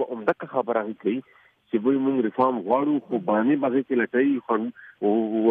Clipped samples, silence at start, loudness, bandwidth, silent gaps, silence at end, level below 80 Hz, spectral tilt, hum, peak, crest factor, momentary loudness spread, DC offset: under 0.1%; 0 s; -24 LUFS; 3.9 kHz; none; 0 s; -76 dBFS; -9.5 dB/octave; none; -8 dBFS; 16 dB; 6 LU; under 0.1%